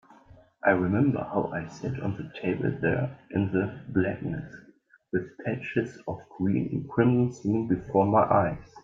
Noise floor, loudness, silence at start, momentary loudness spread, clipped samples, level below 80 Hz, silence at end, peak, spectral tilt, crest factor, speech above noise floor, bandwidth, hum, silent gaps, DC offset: -55 dBFS; -27 LUFS; 0.65 s; 11 LU; under 0.1%; -58 dBFS; 0.05 s; -8 dBFS; -9 dB/octave; 20 dB; 28 dB; 7.6 kHz; none; none; under 0.1%